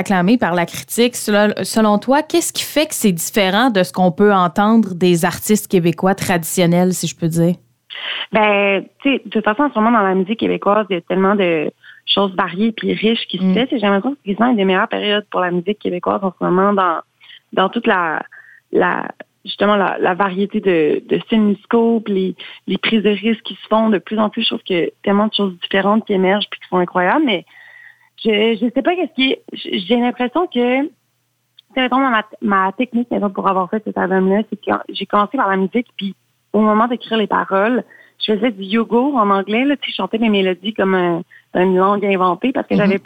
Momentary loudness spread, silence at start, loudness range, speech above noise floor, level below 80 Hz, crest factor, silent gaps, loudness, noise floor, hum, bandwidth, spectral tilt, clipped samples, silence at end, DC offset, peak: 7 LU; 0 s; 3 LU; 50 dB; -56 dBFS; 14 dB; none; -16 LUFS; -66 dBFS; none; 18.5 kHz; -5 dB/octave; under 0.1%; 0.05 s; under 0.1%; -2 dBFS